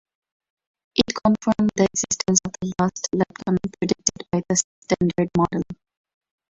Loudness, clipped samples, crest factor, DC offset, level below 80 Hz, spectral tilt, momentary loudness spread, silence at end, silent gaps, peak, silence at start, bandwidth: -22 LUFS; under 0.1%; 22 dB; under 0.1%; -50 dBFS; -4.5 dB/octave; 6 LU; 0.75 s; 4.64-4.82 s; -2 dBFS; 0.95 s; 8.2 kHz